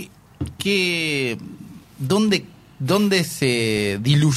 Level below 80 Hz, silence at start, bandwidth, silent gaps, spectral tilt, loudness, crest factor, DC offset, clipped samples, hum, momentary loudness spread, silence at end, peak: -50 dBFS; 0 s; 15.5 kHz; none; -5 dB/octave; -20 LUFS; 16 dB; under 0.1%; under 0.1%; none; 15 LU; 0 s; -4 dBFS